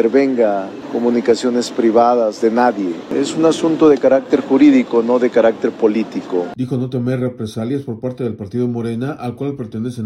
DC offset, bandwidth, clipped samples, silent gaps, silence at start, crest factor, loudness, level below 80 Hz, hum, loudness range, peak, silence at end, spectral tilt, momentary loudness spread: under 0.1%; 12 kHz; under 0.1%; none; 0 s; 14 dB; -16 LUFS; -58 dBFS; none; 8 LU; -2 dBFS; 0 s; -6.5 dB/octave; 12 LU